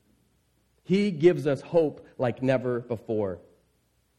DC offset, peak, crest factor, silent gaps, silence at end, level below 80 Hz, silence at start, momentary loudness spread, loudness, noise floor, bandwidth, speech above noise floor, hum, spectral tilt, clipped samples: under 0.1%; -8 dBFS; 20 dB; none; 0.8 s; -66 dBFS; 0.9 s; 9 LU; -26 LUFS; -69 dBFS; 10.5 kHz; 44 dB; none; -8 dB/octave; under 0.1%